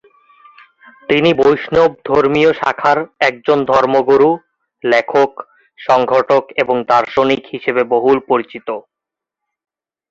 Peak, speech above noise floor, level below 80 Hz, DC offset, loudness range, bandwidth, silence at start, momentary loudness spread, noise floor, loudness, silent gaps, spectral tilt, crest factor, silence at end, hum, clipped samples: 0 dBFS; 70 dB; -52 dBFS; under 0.1%; 3 LU; 7.6 kHz; 1.1 s; 11 LU; -84 dBFS; -14 LUFS; none; -6 dB/octave; 14 dB; 1.3 s; none; under 0.1%